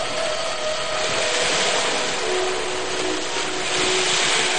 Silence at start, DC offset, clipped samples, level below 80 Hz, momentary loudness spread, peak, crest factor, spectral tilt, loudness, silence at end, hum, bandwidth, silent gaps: 0 s; 3%; under 0.1%; -50 dBFS; 6 LU; -6 dBFS; 18 dB; -1 dB/octave; -21 LUFS; 0 s; none; 10 kHz; none